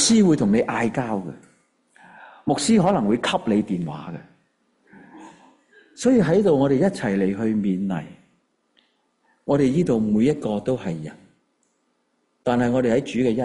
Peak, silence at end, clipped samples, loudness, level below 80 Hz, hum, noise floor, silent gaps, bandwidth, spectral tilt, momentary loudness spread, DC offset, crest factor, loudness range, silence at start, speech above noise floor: -6 dBFS; 0 s; under 0.1%; -21 LUFS; -54 dBFS; none; -69 dBFS; none; 11.5 kHz; -5.5 dB/octave; 14 LU; under 0.1%; 16 dB; 3 LU; 0 s; 49 dB